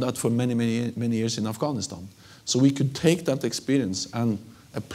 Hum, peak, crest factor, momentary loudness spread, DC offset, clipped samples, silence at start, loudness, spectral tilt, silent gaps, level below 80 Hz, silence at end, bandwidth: none; -6 dBFS; 20 dB; 14 LU; under 0.1%; under 0.1%; 0 s; -25 LUFS; -5.5 dB/octave; none; -64 dBFS; 0 s; 16 kHz